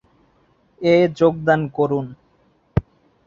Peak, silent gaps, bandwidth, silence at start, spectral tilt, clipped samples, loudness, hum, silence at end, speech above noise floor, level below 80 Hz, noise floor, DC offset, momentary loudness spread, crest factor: -2 dBFS; none; 7.4 kHz; 0.8 s; -8 dB/octave; under 0.1%; -19 LUFS; none; 0.45 s; 42 dB; -42 dBFS; -60 dBFS; under 0.1%; 10 LU; 18 dB